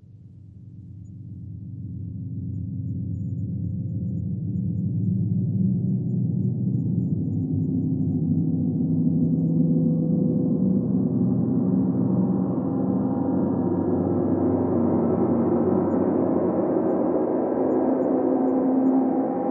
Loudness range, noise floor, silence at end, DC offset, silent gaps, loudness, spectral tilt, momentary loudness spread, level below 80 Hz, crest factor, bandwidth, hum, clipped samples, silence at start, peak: 8 LU; -45 dBFS; 0 s; under 0.1%; none; -23 LUFS; -14.5 dB/octave; 10 LU; -62 dBFS; 14 dB; 2.4 kHz; none; under 0.1%; 0.1 s; -10 dBFS